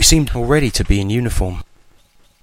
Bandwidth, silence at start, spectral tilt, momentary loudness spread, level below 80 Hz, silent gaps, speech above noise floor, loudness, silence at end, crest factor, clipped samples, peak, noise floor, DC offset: 16.5 kHz; 0 s; -4 dB/octave; 9 LU; -24 dBFS; none; 35 dB; -17 LUFS; 0.8 s; 16 dB; under 0.1%; 0 dBFS; -51 dBFS; under 0.1%